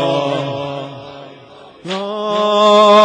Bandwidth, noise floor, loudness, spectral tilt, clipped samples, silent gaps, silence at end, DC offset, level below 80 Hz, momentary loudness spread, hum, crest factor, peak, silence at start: 9.8 kHz; -40 dBFS; -15 LUFS; -5 dB/octave; under 0.1%; none; 0 s; under 0.1%; -62 dBFS; 24 LU; none; 14 dB; -2 dBFS; 0 s